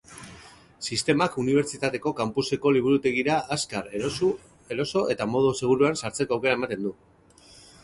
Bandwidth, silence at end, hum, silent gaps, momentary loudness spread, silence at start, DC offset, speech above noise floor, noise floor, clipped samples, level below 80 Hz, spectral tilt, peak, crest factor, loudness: 11.5 kHz; 0.9 s; none; none; 11 LU; 0.1 s; under 0.1%; 29 dB; -53 dBFS; under 0.1%; -58 dBFS; -4.5 dB/octave; -8 dBFS; 18 dB; -25 LUFS